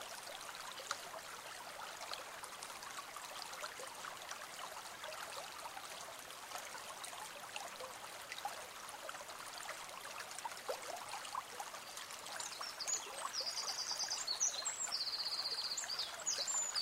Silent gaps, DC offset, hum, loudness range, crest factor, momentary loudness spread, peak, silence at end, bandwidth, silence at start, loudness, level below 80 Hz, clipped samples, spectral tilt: none; under 0.1%; none; 9 LU; 24 dB; 10 LU; -22 dBFS; 0 s; 16 kHz; 0 s; -43 LUFS; -80 dBFS; under 0.1%; 1.5 dB/octave